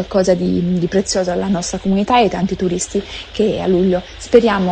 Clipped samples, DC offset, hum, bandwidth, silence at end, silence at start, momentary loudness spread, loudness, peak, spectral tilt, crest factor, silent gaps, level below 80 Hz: under 0.1%; under 0.1%; none; 9.6 kHz; 0 s; 0 s; 7 LU; -16 LUFS; 0 dBFS; -5.5 dB/octave; 16 dB; none; -38 dBFS